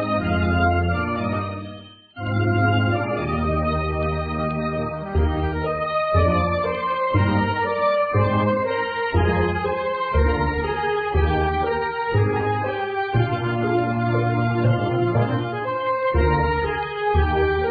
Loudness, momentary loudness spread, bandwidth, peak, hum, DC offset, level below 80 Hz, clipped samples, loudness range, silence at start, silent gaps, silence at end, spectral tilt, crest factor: -22 LUFS; 5 LU; 4.9 kHz; -6 dBFS; none; under 0.1%; -32 dBFS; under 0.1%; 2 LU; 0 s; none; 0 s; -10.5 dB/octave; 14 dB